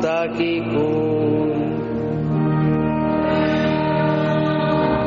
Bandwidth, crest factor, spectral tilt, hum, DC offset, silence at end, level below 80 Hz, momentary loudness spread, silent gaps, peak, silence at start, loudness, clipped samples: 7 kHz; 10 dB; -6.5 dB/octave; none; under 0.1%; 0 s; -42 dBFS; 3 LU; none; -8 dBFS; 0 s; -20 LUFS; under 0.1%